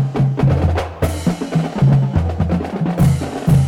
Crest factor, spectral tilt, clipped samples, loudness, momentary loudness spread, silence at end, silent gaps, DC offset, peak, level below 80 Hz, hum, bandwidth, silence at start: 14 dB; -8 dB/octave; under 0.1%; -17 LUFS; 5 LU; 0 s; none; under 0.1%; -2 dBFS; -28 dBFS; none; 14.5 kHz; 0 s